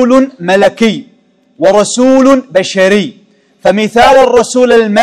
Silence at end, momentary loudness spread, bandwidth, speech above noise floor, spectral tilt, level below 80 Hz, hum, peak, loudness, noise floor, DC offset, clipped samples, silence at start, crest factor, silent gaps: 0 s; 7 LU; 13 kHz; 41 dB; -4.5 dB/octave; -42 dBFS; none; 0 dBFS; -8 LUFS; -48 dBFS; under 0.1%; 5%; 0 s; 8 dB; none